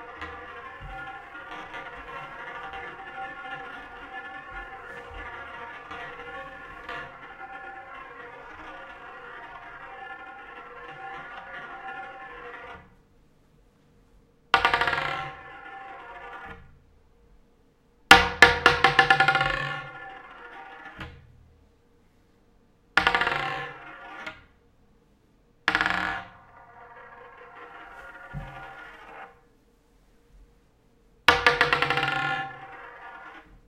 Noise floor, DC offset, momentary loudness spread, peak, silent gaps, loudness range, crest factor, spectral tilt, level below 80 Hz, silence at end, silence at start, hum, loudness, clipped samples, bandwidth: -61 dBFS; under 0.1%; 24 LU; 0 dBFS; none; 21 LU; 30 dB; -3 dB/octave; -52 dBFS; 0.15 s; 0 s; none; -24 LUFS; under 0.1%; 16 kHz